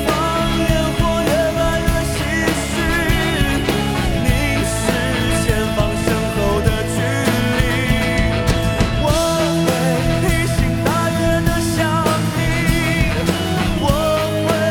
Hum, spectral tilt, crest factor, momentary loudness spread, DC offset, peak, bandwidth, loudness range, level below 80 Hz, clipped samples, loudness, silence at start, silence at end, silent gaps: none; -5 dB/octave; 16 dB; 2 LU; under 0.1%; -2 dBFS; 19.5 kHz; 1 LU; -26 dBFS; under 0.1%; -17 LUFS; 0 s; 0 s; none